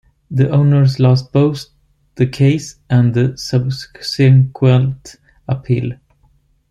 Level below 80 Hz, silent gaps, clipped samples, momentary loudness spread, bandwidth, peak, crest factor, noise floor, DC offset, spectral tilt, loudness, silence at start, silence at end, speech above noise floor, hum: -46 dBFS; none; under 0.1%; 12 LU; 9 kHz; -2 dBFS; 12 dB; -55 dBFS; under 0.1%; -7.5 dB/octave; -15 LUFS; 0.3 s; 0.75 s; 42 dB; none